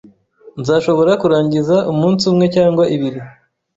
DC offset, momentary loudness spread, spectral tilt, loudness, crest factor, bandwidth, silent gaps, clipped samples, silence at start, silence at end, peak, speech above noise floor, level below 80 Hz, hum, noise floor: under 0.1%; 11 LU; -7 dB/octave; -14 LUFS; 12 dB; 8 kHz; none; under 0.1%; 0.55 s; 0.45 s; -2 dBFS; 31 dB; -52 dBFS; none; -44 dBFS